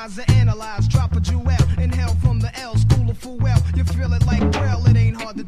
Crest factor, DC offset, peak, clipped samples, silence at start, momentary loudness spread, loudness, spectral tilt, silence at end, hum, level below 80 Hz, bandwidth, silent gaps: 14 dB; under 0.1%; -4 dBFS; under 0.1%; 0 s; 5 LU; -19 LUFS; -7 dB/octave; 0 s; none; -24 dBFS; 11 kHz; none